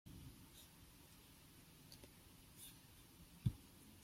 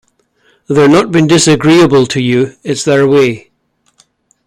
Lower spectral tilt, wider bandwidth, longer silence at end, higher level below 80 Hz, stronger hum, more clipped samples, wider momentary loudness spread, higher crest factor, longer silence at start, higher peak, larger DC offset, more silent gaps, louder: about the same, -5.5 dB/octave vs -5 dB/octave; first, 16.5 kHz vs 13.5 kHz; second, 0 s vs 1.1 s; second, -66 dBFS vs -46 dBFS; neither; neither; first, 17 LU vs 8 LU; first, 28 dB vs 10 dB; second, 0.05 s vs 0.7 s; second, -26 dBFS vs 0 dBFS; neither; neither; second, -55 LUFS vs -9 LUFS